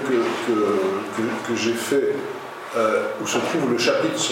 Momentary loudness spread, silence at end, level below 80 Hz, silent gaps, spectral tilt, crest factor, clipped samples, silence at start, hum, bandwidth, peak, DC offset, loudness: 6 LU; 0 s; -70 dBFS; none; -3.5 dB/octave; 16 dB; under 0.1%; 0 s; none; 16.5 kHz; -6 dBFS; under 0.1%; -22 LUFS